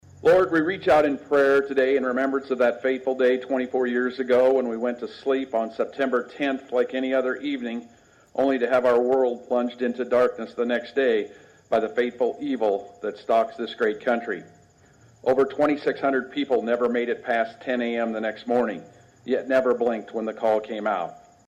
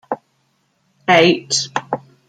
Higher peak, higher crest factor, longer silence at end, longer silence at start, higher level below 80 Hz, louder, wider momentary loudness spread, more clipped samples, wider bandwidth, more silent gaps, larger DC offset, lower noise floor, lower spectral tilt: second, -10 dBFS vs -2 dBFS; about the same, 14 dB vs 18 dB; about the same, 0.3 s vs 0.3 s; about the same, 0.2 s vs 0.1 s; about the same, -64 dBFS vs -64 dBFS; second, -24 LUFS vs -16 LUFS; second, 9 LU vs 16 LU; neither; about the same, 9.2 kHz vs 10 kHz; neither; neither; second, -55 dBFS vs -64 dBFS; first, -6 dB/octave vs -3.5 dB/octave